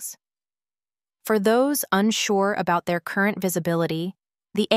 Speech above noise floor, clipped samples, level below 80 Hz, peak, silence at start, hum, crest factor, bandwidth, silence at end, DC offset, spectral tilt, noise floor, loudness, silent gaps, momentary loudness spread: over 68 dB; under 0.1%; -66 dBFS; -4 dBFS; 0 s; none; 20 dB; 16 kHz; 0 s; under 0.1%; -4.5 dB/octave; under -90 dBFS; -23 LUFS; none; 10 LU